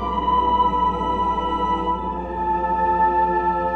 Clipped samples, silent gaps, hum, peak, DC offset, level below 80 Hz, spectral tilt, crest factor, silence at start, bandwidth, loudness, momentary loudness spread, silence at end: under 0.1%; none; none; -8 dBFS; under 0.1%; -36 dBFS; -7 dB/octave; 12 dB; 0 s; 6.4 kHz; -20 LUFS; 6 LU; 0 s